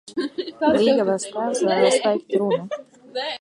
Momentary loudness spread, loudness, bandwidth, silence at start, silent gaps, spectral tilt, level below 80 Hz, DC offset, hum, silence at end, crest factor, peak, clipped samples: 12 LU; -21 LUFS; 11.5 kHz; 0.05 s; none; -4 dB/octave; -62 dBFS; under 0.1%; none; 0.05 s; 18 dB; -4 dBFS; under 0.1%